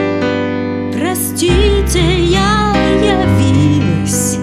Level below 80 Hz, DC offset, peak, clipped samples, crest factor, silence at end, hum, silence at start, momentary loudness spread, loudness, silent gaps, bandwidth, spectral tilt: -22 dBFS; under 0.1%; 0 dBFS; under 0.1%; 12 dB; 0 s; none; 0 s; 5 LU; -13 LUFS; none; 15.5 kHz; -5 dB/octave